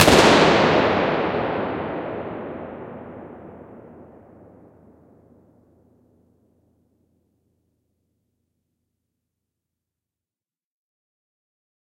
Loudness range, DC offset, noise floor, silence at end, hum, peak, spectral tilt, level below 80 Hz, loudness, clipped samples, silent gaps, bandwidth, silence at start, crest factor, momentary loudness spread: 27 LU; under 0.1%; under -90 dBFS; 8 s; none; -2 dBFS; -4 dB/octave; -50 dBFS; -19 LUFS; under 0.1%; none; 16 kHz; 0 s; 24 dB; 27 LU